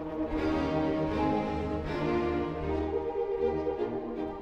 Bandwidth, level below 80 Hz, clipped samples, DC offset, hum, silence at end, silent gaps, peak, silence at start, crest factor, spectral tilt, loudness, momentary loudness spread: 8 kHz; -44 dBFS; under 0.1%; under 0.1%; none; 0 s; none; -16 dBFS; 0 s; 14 dB; -8 dB/octave; -31 LUFS; 4 LU